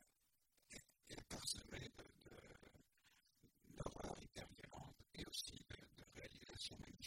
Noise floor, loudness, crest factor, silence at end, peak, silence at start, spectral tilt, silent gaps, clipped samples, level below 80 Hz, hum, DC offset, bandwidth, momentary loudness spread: -84 dBFS; -54 LUFS; 26 dB; 0 s; -30 dBFS; 0 s; -3 dB/octave; none; under 0.1%; -68 dBFS; none; under 0.1%; 16.5 kHz; 15 LU